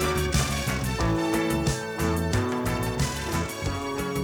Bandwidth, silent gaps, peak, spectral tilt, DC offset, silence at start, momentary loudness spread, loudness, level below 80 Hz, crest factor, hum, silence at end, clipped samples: over 20 kHz; none; -12 dBFS; -5 dB/octave; under 0.1%; 0 s; 5 LU; -27 LUFS; -36 dBFS; 14 dB; none; 0 s; under 0.1%